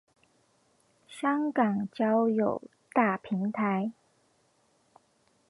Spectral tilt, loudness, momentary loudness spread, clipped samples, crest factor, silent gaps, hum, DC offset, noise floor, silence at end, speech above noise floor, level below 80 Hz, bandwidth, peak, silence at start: -7.5 dB/octave; -29 LUFS; 7 LU; under 0.1%; 20 dB; none; none; under 0.1%; -69 dBFS; 1.6 s; 41 dB; -76 dBFS; 11.5 kHz; -10 dBFS; 1.1 s